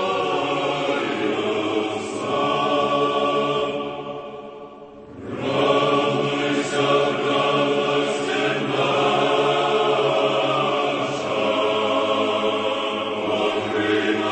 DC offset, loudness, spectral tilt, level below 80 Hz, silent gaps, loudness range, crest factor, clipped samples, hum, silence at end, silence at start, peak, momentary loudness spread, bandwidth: under 0.1%; -21 LUFS; -4.5 dB/octave; -62 dBFS; none; 4 LU; 16 dB; under 0.1%; none; 0 s; 0 s; -6 dBFS; 9 LU; 8.8 kHz